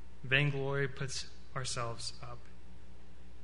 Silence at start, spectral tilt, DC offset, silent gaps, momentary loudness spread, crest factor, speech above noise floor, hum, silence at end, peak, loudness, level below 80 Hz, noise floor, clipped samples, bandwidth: 0 s; -4 dB/octave; 1%; none; 18 LU; 24 dB; 20 dB; none; 0 s; -14 dBFS; -35 LUFS; -56 dBFS; -55 dBFS; under 0.1%; 10.5 kHz